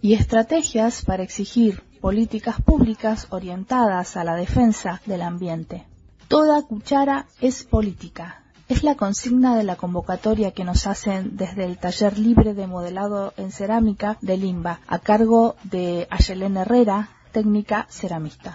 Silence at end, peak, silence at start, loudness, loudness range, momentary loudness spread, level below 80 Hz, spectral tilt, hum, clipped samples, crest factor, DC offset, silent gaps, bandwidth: 0 s; 0 dBFS; 0.05 s; -21 LUFS; 2 LU; 11 LU; -32 dBFS; -6 dB/octave; none; under 0.1%; 20 dB; under 0.1%; none; 8 kHz